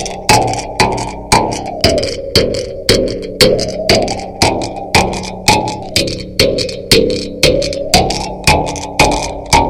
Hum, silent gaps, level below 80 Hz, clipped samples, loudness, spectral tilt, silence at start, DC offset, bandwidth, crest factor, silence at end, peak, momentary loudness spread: none; none; -28 dBFS; 0.2%; -13 LUFS; -3.5 dB/octave; 0 s; under 0.1%; over 20 kHz; 14 dB; 0 s; 0 dBFS; 7 LU